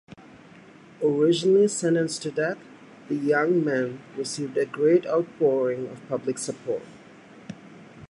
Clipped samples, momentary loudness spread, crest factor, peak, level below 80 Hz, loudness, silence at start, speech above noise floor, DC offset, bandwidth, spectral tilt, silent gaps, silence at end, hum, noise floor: under 0.1%; 13 LU; 16 dB; -8 dBFS; -72 dBFS; -25 LUFS; 0.35 s; 25 dB; under 0.1%; 11.5 kHz; -5 dB/octave; none; 0.05 s; none; -49 dBFS